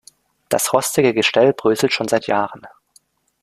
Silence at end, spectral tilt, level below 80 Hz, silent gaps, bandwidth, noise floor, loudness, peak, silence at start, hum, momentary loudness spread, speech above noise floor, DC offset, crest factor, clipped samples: 0.75 s; -3.5 dB/octave; -60 dBFS; none; 15.5 kHz; -57 dBFS; -17 LUFS; 0 dBFS; 0.5 s; none; 6 LU; 40 dB; under 0.1%; 18 dB; under 0.1%